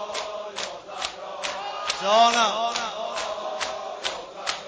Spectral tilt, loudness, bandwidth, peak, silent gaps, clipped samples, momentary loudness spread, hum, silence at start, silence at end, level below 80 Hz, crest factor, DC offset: -1 dB/octave; -26 LUFS; 8 kHz; -8 dBFS; none; under 0.1%; 13 LU; none; 0 s; 0 s; -64 dBFS; 18 dB; under 0.1%